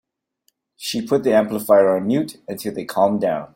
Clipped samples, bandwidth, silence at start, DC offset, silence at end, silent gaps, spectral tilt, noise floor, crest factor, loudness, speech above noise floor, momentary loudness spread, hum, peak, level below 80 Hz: under 0.1%; 16.5 kHz; 0.8 s; under 0.1%; 0.1 s; none; -5.5 dB/octave; -68 dBFS; 18 dB; -19 LUFS; 49 dB; 13 LU; none; -2 dBFS; -62 dBFS